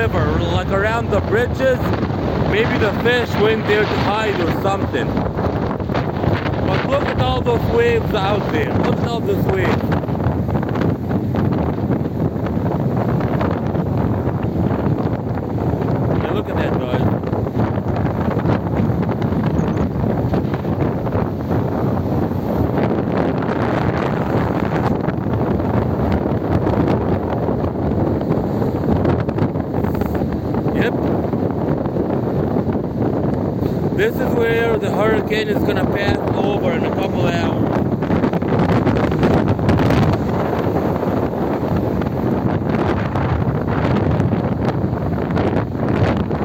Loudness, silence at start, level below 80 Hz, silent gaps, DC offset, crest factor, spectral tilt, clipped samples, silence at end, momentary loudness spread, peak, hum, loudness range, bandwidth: -18 LUFS; 0 s; -34 dBFS; none; under 0.1%; 14 dB; -8 dB/octave; under 0.1%; 0 s; 4 LU; -4 dBFS; none; 2 LU; 16.5 kHz